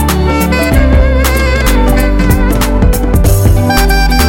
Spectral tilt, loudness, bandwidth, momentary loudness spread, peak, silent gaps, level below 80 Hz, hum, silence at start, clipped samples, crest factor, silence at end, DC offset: -5.5 dB/octave; -10 LUFS; 17 kHz; 2 LU; 0 dBFS; none; -10 dBFS; none; 0 s; under 0.1%; 8 dB; 0 s; under 0.1%